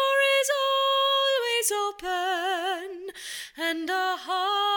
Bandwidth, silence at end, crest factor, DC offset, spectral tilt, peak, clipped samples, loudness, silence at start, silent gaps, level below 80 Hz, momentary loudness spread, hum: 18 kHz; 0 s; 14 dB; under 0.1%; 1.5 dB/octave; -12 dBFS; under 0.1%; -25 LUFS; 0 s; none; -68 dBFS; 13 LU; none